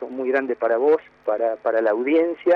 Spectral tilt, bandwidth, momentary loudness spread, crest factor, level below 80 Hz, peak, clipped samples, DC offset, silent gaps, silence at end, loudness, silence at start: -6.5 dB/octave; 5.4 kHz; 4 LU; 14 dB; -72 dBFS; -8 dBFS; under 0.1%; under 0.1%; none; 0 s; -21 LUFS; 0 s